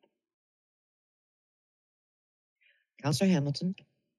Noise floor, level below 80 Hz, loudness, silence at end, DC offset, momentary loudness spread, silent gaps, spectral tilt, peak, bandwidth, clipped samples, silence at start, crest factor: under -90 dBFS; -78 dBFS; -30 LUFS; 0.45 s; under 0.1%; 10 LU; none; -6 dB/octave; -16 dBFS; 12 kHz; under 0.1%; 3.05 s; 18 dB